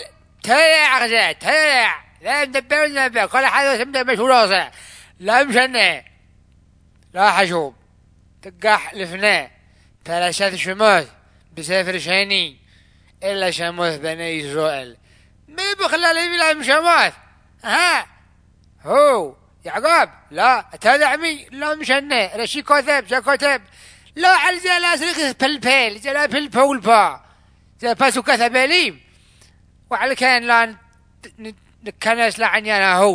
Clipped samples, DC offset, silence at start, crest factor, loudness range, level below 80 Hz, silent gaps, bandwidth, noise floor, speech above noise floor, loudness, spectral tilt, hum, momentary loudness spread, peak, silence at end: under 0.1%; under 0.1%; 0 s; 18 dB; 5 LU; -56 dBFS; none; 11 kHz; -53 dBFS; 36 dB; -16 LUFS; -2 dB/octave; none; 13 LU; 0 dBFS; 0 s